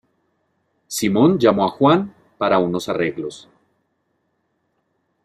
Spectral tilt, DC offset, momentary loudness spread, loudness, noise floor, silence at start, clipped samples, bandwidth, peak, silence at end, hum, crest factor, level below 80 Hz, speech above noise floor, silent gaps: -5.5 dB/octave; under 0.1%; 14 LU; -18 LUFS; -70 dBFS; 0.9 s; under 0.1%; 15 kHz; -2 dBFS; 1.85 s; none; 20 dB; -60 dBFS; 52 dB; none